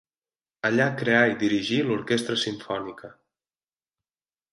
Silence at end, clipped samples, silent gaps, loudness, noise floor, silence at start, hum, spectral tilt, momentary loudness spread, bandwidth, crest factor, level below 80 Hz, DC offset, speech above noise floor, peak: 1.45 s; under 0.1%; none; -24 LUFS; under -90 dBFS; 0.65 s; none; -5 dB/octave; 12 LU; 11.5 kHz; 20 dB; -66 dBFS; under 0.1%; over 66 dB; -6 dBFS